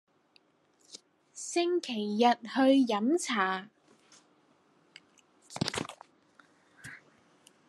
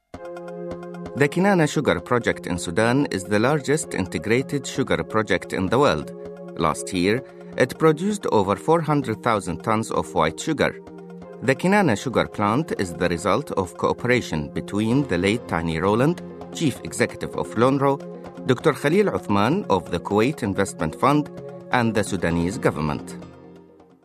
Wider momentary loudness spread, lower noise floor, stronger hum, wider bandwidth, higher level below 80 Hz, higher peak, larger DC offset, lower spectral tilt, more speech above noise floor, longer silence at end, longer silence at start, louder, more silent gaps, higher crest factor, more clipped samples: first, 26 LU vs 12 LU; first, -68 dBFS vs -49 dBFS; neither; second, 12.5 kHz vs 14 kHz; second, -74 dBFS vs -50 dBFS; second, -12 dBFS vs -2 dBFS; neither; second, -4 dB/octave vs -5.5 dB/octave; first, 41 dB vs 27 dB; first, 0.75 s vs 0.45 s; first, 0.95 s vs 0.15 s; second, -29 LUFS vs -22 LUFS; neither; about the same, 22 dB vs 20 dB; neither